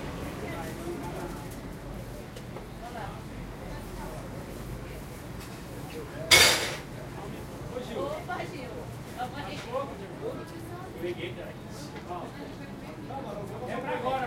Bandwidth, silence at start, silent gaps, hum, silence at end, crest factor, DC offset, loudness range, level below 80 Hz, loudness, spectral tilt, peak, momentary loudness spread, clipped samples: 16 kHz; 0 s; none; none; 0 s; 30 dB; under 0.1%; 14 LU; -48 dBFS; -32 LUFS; -2.5 dB/octave; -2 dBFS; 9 LU; under 0.1%